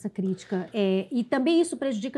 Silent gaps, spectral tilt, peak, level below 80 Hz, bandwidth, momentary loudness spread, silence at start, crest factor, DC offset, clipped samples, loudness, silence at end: none; -6 dB/octave; -12 dBFS; -74 dBFS; 11.5 kHz; 8 LU; 0 s; 14 dB; under 0.1%; under 0.1%; -26 LUFS; 0 s